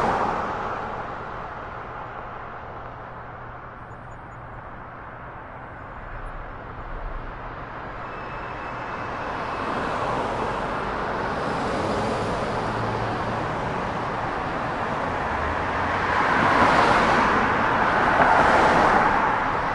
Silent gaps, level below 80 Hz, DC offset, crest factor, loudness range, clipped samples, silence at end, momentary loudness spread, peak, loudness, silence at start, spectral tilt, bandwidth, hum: none; -42 dBFS; under 0.1%; 22 dB; 19 LU; under 0.1%; 0 s; 20 LU; -4 dBFS; -23 LUFS; 0 s; -5.5 dB/octave; 11.5 kHz; none